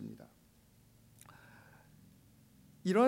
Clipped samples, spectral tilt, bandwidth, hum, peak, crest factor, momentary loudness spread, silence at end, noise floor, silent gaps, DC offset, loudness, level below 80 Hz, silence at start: under 0.1%; -6.5 dB/octave; 16 kHz; none; -18 dBFS; 20 dB; 21 LU; 0 s; -65 dBFS; none; under 0.1%; -40 LUFS; -74 dBFS; 0 s